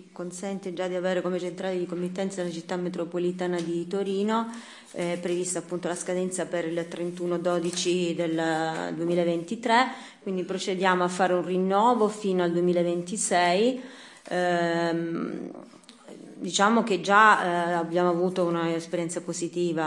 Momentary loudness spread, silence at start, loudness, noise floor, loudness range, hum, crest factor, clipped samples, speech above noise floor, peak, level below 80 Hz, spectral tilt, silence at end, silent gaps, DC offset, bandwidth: 11 LU; 0 s; -26 LUFS; -47 dBFS; 6 LU; none; 22 dB; under 0.1%; 21 dB; -6 dBFS; -78 dBFS; -4.5 dB/octave; 0 s; none; under 0.1%; 12 kHz